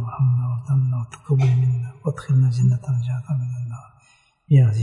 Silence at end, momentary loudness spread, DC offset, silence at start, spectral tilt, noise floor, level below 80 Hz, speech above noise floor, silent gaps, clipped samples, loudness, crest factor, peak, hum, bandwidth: 0 s; 11 LU; under 0.1%; 0 s; -9 dB/octave; -58 dBFS; -56 dBFS; 39 dB; none; under 0.1%; -21 LUFS; 14 dB; -6 dBFS; none; 7.2 kHz